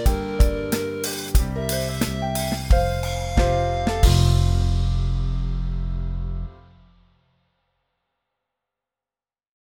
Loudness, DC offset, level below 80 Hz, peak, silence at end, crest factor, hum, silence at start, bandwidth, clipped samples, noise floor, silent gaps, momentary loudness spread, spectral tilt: -23 LUFS; under 0.1%; -24 dBFS; -4 dBFS; 3.1 s; 18 dB; none; 0 s; over 20 kHz; under 0.1%; under -90 dBFS; none; 10 LU; -5.5 dB/octave